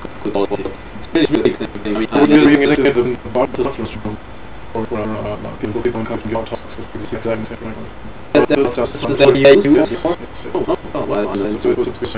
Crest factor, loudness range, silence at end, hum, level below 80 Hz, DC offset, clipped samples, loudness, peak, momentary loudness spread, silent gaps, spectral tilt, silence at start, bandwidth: 16 dB; 9 LU; 0 s; none; -38 dBFS; 3%; under 0.1%; -16 LUFS; 0 dBFS; 18 LU; none; -10.5 dB/octave; 0 s; 4 kHz